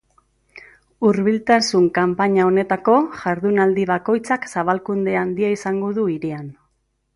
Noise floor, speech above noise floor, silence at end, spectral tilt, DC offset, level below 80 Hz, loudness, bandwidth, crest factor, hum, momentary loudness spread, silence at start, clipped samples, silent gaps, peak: -68 dBFS; 50 dB; 0.65 s; -6 dB/octave; under 0.1%; -58 dBFS; -19 LUFS; 11.5 kHz; 16 dB; none; 6 LU; 0.55 s; under 0.1%; none; -2 dBFS